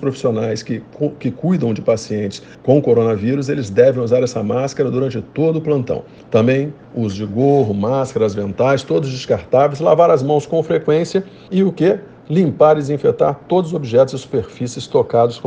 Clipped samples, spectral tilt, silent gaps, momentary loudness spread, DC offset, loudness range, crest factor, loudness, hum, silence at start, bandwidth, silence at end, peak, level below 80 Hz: under 0.1%; -7 dB/octave; none; 10 LU; under 0.1%; 2 LU; 16 dB; -17 LUFS; none; 0 s; 9.4 kHz; 0 s; 0 dBFS; -52 dBFS